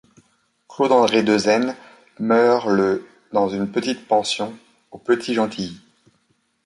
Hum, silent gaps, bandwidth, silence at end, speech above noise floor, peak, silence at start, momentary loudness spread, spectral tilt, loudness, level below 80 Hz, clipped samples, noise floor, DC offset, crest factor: none; none; 11.5 kHz; 0.9 s; 47 dB; -4 dBFS; 0.7 s; 13 LU; -4.5 dB/octave; -20 LUFS; -62 dBFS; under 0.1%; -66 dBFS; under 0.1%; 18 dB